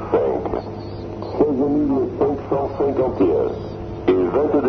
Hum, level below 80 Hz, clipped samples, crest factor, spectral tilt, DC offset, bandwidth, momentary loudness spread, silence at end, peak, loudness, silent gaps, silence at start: none; -40 dBFS; under 0.1%; 16 dB; -9.5 dB/octave; under 0.1%; 6.2 kHz; 12 LU; 0 s; -4 dBFS; -20 LUFS; none; 0 s